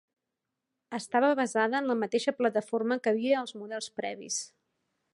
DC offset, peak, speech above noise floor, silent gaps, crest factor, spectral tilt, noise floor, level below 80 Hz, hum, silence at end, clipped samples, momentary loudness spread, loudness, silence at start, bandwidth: under 0.1%; -12 dBFS; 57 dB; none; 18 dB; -3.5 dB/octave; -86 dBFS; -84 dBFS; none; 0.65 s; under 0.1%; 12 LU; -29 LUFS; 0.9 s; 11.5 kHz